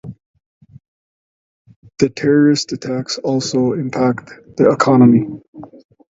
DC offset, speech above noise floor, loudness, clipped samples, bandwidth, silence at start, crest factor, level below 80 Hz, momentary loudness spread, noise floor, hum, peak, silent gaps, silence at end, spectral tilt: under 0.1%; over 75 dB; -15 LUFS; under 0.1%; 7.8 kHz; 0.05 s; 16 dB; -56 dBFS; 17 LU; under -90 dBFS; none; 0 dBFS; 0.26-0.34 s, 0.46-0.61 s, 0.88-1.65 s, 1.76-1.82 s, 5.48-5.53 s; 0.45 s; -6 dB/octave